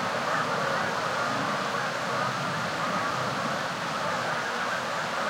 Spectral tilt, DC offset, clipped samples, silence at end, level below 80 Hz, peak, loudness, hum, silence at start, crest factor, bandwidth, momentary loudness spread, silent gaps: -3.5 dB/octave; under 0.1%; under 0.1%; 0 s; -68 dBFS; -14 dBFS; -28 LUFS; none; 0 s; 14 dB; 16.5 kHz; 2 LU; none